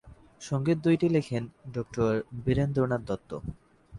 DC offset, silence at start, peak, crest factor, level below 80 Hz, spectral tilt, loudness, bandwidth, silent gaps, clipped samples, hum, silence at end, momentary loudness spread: under 0.1%; 0.05 s; -14 dBFS; 16 dB; -50 dBFS; -7.5 dB/octave; -29 LUFS; 11.5 kHz; none; under 0.1%; none; 0 s; 14 LU